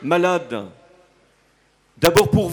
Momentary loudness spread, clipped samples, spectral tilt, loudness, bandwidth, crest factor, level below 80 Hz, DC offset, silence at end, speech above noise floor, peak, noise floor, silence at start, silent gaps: 16 LU; under 0.1%; -5 dB/octave; -18 LUFS; over 20 kHz; 20 dB; -44 dBFS; under 0.1%; 0 s; 42 dB; 0 dBFS; -60 dBFS; 0 s; none